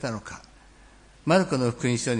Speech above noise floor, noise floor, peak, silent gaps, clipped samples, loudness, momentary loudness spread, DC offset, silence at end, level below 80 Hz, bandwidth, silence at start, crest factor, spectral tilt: 28 dB; -53 dBFS; -8 dBFS; none; under 0.1%; -25 LUFS; 19 LU; under 0.1%; 0 s; -54 dBFS; 10.5 kHz; 0 s; 18 dB; -5.5 dB/octave